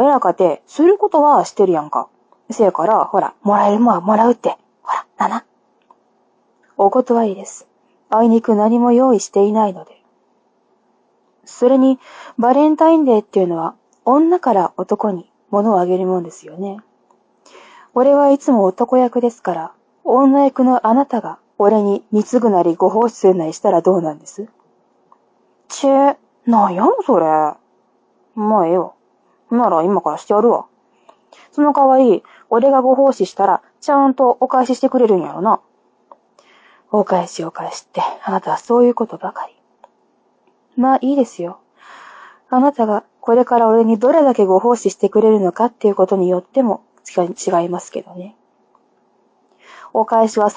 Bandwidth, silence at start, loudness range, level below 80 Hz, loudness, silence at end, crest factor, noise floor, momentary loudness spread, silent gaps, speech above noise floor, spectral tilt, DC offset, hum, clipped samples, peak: 8 kHz; 0 s; 6 LU; -68 dBFS; -15 LUFS; 0.05 s; 16 dB; -60 dBFS; 14 LU; none; 46 dB; -6.5 dB/octave; under 0.1%; none; under 0.1%; 0 dBFS